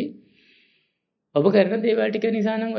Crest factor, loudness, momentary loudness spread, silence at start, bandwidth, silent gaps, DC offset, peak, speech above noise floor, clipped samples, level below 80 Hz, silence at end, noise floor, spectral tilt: 18 dB; -21 LUFS; 7 LU; 0 s; 6.2 kHz; none; under 0.1%; -4 dBFS; 56 dB; under 0.1%; -78 dBFS; 0 s; -76 dBFS; -8 dB/octave